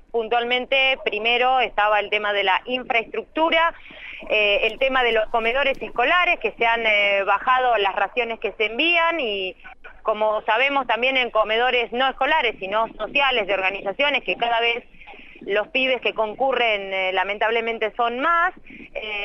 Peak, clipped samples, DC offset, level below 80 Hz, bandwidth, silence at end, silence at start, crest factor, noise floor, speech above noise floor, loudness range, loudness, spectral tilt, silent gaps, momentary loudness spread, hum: -6 dBFS; under 0.1%; under 0.1%; -48 dBFS; 6.8 kHz; 0 s; 0.15 s; 16 dB; -42 dBFS; 20 dB; 3 LU; -20 LUFS; -4 dB/octave; none; 7 LU; none